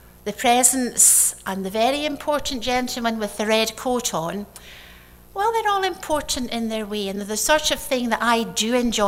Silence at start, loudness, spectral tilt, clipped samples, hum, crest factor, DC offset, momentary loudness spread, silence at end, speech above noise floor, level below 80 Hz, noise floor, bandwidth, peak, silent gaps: 0.05 s; -20 LUFS; -1.5 dB/octave; under 0.1%; 60 Hz at -50 dBFS; 20 dB; under 0.1%; 11 LU; 0 s; 24 dB; -46 dBFS; -46 dBFS; 16 kHz; -2 dBFS; none